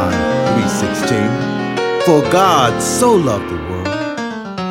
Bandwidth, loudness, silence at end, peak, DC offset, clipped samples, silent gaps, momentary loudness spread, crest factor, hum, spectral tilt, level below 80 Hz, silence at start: 16.5 kHz; -15 LUFS; 0 s; 0 dBFS; under 0.1%; under 0.1%; none; 10 LU; 14 dB; none; -5 dB/octave; -44 dBFS; 0 s